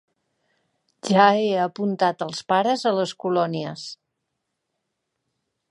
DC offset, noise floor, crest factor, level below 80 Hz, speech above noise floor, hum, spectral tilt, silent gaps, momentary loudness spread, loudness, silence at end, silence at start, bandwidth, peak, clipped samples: under 0.1%; -79 dBFS; 22 dB; -74 dBFS; 58 dB; none; -5 dB/octave; none; 15 LU; -22 LUFS; 1.75 s; 1.05 s; 11.5 kHz; -2 dBFS; under 0.1%